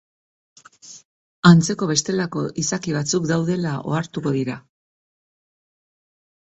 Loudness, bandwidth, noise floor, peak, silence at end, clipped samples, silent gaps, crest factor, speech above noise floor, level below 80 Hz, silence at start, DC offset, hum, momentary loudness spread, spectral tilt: -20 LUFS; 8.2 kHz; -45 dBFS; 0 dBFS; 1.9 s; under 0.1%; 1.05-1.43 s; 22 dB; 25 dB; -58 dBFS; 0.85 s; under 0.1%; none; 11 LU; -5 dB/octave